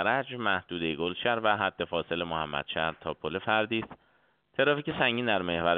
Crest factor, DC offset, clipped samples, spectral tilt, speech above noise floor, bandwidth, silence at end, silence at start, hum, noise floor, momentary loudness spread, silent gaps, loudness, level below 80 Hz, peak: 22 dB; under 0.1%; under 0.1%; -2 dB/octave; 39 dB; 4.6 kHz; 0 s; 0 s; none; -68 dBFS; 7 LU; none; -29 LUFS; -60 dBFS; -8 dBFS